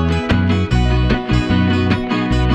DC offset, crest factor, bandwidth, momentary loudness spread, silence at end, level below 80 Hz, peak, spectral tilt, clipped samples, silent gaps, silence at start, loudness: under 0.1%; 12 dB; 9.4 kHz; 2 LU; 0 s; -22 dBFS; -2 dBFS; -7 dB/octave; under 0.1%; none; 0 s; -16 LUFS